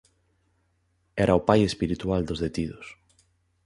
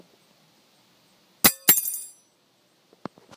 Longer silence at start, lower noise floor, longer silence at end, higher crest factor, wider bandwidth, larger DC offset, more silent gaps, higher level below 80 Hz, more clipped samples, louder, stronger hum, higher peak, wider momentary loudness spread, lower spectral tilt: second, 1.15 s vs 1.45 s; first, -70 dBFS vs -64 dBFS; second, 0.7 s vs 1.3 s; about the same, 24 dB vs 28 dB; second, 11.5 kHz vs 16 kHz; neither; neither; first, -46 dBFS vs -62 dBFS; neither; second, -25 LUFS vs -19 LUFS; neither; second, -4 dBFS vs 0 dBFS; second, 16 LU vs 26 LU; first, -6.5 dB/octave vs -1 dB/octave